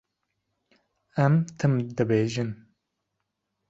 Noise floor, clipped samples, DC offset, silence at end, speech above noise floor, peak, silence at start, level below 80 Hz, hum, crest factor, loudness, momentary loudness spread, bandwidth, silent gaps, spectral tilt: -81 dBFS; under 0.1%; under 0.1%; 1.15 s; 57 dB; -8 dBFS; 1.15 s; -62 dBFS; none; 20 dB; -26 LUFS; 12 LU; 7.8 kHz; none; -7.5 dB/octave